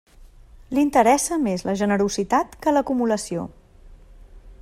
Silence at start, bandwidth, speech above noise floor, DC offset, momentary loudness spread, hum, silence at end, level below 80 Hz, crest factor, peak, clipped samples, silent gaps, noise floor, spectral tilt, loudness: 0.2 s; 15 kHz; 26 dB; under 0.1%; 10 LU; none; 0.1 s; -48 dBFS; 18 dB; -4 dBFS; under 0.1%; none; -47 dBFS; -4.5 dB/octave; -21 LUFS